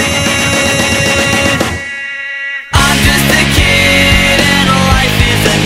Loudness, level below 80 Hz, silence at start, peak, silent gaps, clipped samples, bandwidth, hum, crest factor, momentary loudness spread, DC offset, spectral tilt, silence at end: -9 LUFS; -22 dBFS; 0 s; 0 dBFS; none; 0.2%; 16.5 kHz; none; 10 dB; 11 LU; under 0.1%; -3.5 dB/octave; 0 s